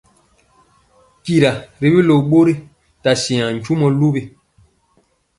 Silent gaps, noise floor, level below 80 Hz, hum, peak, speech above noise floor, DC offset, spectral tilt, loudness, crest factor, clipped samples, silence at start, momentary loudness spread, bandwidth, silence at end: none; -60 dBFS; -52 dBFS; none; 0 dBFS; 46 dB; under 0.1%; -6.5 dB/octave; -16 LUFS; 16 dB; under 0.1%; 1.25 s; 9 LU; 11.5 kHz; 1.1 s